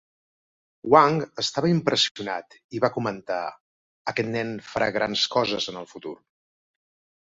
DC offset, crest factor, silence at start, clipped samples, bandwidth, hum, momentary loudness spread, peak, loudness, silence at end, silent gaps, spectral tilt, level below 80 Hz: under 0.1%; 24 dB; 0.85 s; under 0.1%; 8 kHz; none; 18 LU; -2 dBFS; -24 LUFS; 1.1 s; 2.11-2.15 s, 2.64-2.69 s, 3.60-4.05 s; -4.5 dB/octave; -62 dBFS